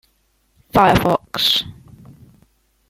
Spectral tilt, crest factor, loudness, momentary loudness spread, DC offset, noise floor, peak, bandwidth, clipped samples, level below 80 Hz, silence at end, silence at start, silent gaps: -4.5 dB/octave; 18 dB; -16 LUFS; 6 LU; under 0.1%; -63 dBFS; -2 dBFS; 16.5 kHz; under 0.1%; -40 dBFS; 1.2 s; 0.75 s; none